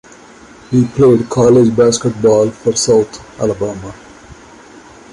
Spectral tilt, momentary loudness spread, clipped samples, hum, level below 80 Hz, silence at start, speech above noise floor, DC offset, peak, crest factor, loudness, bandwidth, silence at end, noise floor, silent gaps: -5.5 dB/octave; 12 LU; under 0.1%; none; -44 dBFS; 0.7 s; 27 dB; under 0.1%; -2 dBFS; 12 dB; -12 LUFS; 11.5 kHz; 0.8 s; -39 dBFS; none